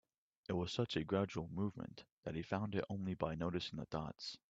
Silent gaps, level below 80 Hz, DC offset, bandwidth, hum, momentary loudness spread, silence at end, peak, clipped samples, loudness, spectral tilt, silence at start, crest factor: 2.12-2.23 s; -66 dBFS; under 0.1%; 7.8 kHz; none; 9 LU; 0.15 s; -22 dBFS; under 0.1%; -42 LUFS; -6.5 dB/octave; 0.5 s; 20 dB